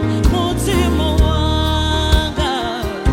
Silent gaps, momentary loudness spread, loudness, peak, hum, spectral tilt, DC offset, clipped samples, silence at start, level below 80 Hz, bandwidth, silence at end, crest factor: none; 4 LU; -17 LUFS; 0 dBFS; none; -5.5 dB/octave; under 0.1%; under 0.1%; 0 s; -20 dBFS; 16.5 kHz; 0 s; 14 dB